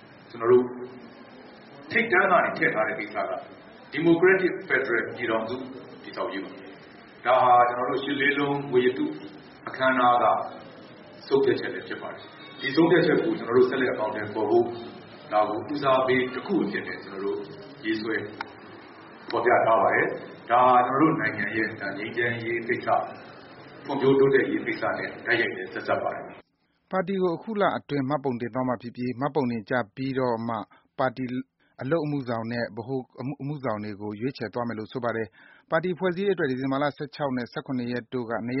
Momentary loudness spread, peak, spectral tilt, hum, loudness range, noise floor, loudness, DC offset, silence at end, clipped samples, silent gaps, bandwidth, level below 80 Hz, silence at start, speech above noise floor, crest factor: 19 LU; -8 dBFS; -4 dB/octave; none; 6 LU; -70 dBFS; -25 LUFS; under 0.1%; 0 s; under 0.1%; none; 5.8 kHz; -66 dBFS; 0 s; 45 dB; 18 dB